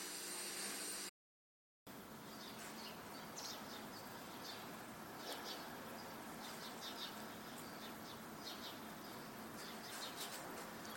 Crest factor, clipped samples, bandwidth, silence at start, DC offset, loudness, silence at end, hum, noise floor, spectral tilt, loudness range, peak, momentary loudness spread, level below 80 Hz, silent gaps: 20 dB; under 0.1%; 17 kHz; 0 s; under 0.1%; -49 LUFS; 0 s; none; under -90 dBFS; -2 dB/octave; 2 LU; -30 dBFS; 7 LU; -80 dBFS; 1.09-1.86 s